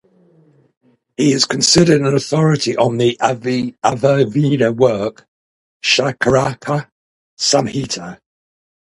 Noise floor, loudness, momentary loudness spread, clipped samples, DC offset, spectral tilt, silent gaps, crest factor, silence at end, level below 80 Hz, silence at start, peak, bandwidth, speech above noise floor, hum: -52 dBFS; -15 LUFS; 11 LU; under 0.1%; under 0.1%; -4.5 dB/octave; 5.28-5.80 s, 6.92-7.37 s; 16 dB; 0.7 s; -50 dBFS; 1.2 s; 0 dBFS; 11.5 kHz; 37 dB; none